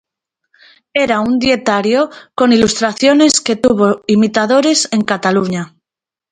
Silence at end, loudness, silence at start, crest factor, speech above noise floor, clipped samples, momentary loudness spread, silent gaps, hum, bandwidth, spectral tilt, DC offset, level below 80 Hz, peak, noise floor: 0.65 s; -13 LUFS; 0.95 s; 14 dB; 75 dB; under 0.1%; 6 LU; none; none; 10 kHz; -4 dB/octave; under 0.1%; -48 dBFS; 0 dBFS; -87 dBFS